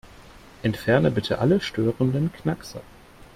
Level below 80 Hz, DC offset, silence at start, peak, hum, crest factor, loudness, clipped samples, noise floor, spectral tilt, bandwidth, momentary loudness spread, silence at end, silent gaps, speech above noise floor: -50 dBFS; under 0.1%; 0.2 s; -6 dBFS; none; 18 dB; -24 LUFS; under 0.1%; -47 dBFS; -7 dB/octave; 15.5 kHz; 11 LU; 0.55 s; none; 24 dB